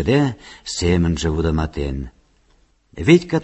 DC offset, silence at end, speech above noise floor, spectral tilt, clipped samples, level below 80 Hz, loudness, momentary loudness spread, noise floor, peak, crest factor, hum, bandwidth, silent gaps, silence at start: under 0.1%; 0 s; 40 dB; -6 dB/octave; under 0.1%; -30 dBFS; -19 LUFS; 15 LU; -58 dBFS; 0 dBFS; 20 dB; none; 8.4 kHz; none; 0 s